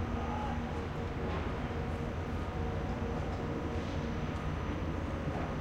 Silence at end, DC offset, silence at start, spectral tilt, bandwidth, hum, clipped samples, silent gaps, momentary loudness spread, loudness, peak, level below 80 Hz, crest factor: 0 s; under 0.1%; 0 s; -7.5 dB/octave; 9.6 kHz; none; under 0.1%; none; 1 LU; -37 LUFS; -22 dBFS; -42 dBFS; 14 dB